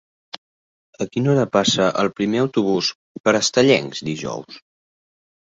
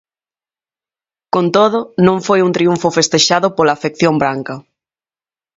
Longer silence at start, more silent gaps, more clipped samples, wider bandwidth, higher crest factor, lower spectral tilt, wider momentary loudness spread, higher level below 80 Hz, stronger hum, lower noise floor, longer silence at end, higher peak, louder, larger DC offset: second, 0.35 s vs 1.35 s; first, 0.38-0.93 s, 2.95-3.24 s vs none; neither; about the same, 8.2 kHz vs 8 kHz; about the same, 18 dB vs 16 dB; about the same, -4.5 dB/octave vs -4.5 dB/octave; first, 17 LU vs 7 LU; about the same, -58 dBFS vs -56 dBFS; neither; about the same, under -90 dBFS vs under -90 dBFS; about the same, 1 s vs 0.95 s; about the same, -2 dBFS vs 0 dBFS; second, -19 LUFS vs -13 LUFS; neither